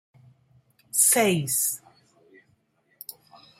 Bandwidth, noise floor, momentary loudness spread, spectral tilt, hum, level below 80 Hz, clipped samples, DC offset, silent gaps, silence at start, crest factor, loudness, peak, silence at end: 16 kHz; -67 dBFS; 24 LU; -2.5 dB/octave; none; -72 dBFS; under 0.1%; under 0.1%; none; 0.95 s; 22 dB; -21 LUFS; -8 dBFS; 1.85 s